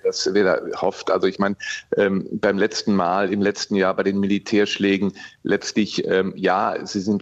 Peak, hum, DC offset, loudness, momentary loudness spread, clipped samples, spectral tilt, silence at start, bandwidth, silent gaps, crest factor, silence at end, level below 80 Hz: -6 dBFS; none; under 0.1%; -21 LUFS; 5 LU; under 0.1%; -5 dB/octave; 0.05 s; 8.2 kHz; none; 14 dB; 0 s; -62 dBFS